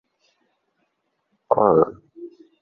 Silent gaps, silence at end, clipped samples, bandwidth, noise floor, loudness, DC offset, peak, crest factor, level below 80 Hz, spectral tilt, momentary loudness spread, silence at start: none; 0.35 s; under 0.1%; 2.8 kHz; -73 dBFS; -19 LUFS; under 0.1%; -2 dBFS; 22 dB; -60 dBFS; -11.5 dB/octave; 25 LU; 1.5 s